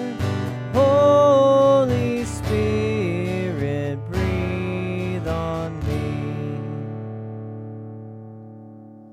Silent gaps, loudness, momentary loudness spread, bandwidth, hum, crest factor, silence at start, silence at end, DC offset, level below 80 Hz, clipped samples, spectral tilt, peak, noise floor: none; -21 LUFS; 21 LU; 13 kHz; none; 16 dB; 0 s; 0 s; under 0.1%; -44 dBFS; under 0.1%; -7 dB/octave; -6 dBFS; -42 dBFS